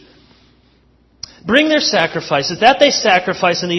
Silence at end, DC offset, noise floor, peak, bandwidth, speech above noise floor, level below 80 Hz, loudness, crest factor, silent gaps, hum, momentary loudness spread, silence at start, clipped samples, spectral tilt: 0 s; under 0.1%; -53 dBFS; 0 dBFS; 11 kHz; 40 dB; -52 dBFS; -13 LUFS; 16 dB; none; none; 14 LU; 1.45 s; under 0.1%; -3 dB/octave